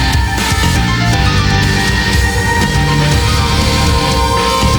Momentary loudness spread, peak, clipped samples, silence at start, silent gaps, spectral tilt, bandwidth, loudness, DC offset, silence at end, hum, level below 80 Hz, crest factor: 1 LU; 0 dBFS; under 0.1%; 0 s; none; -4.5 dB/octave; over 20 kHz; -12 LUFS; under 0.1%; 0 s; none; -18 dBFS; 10 dB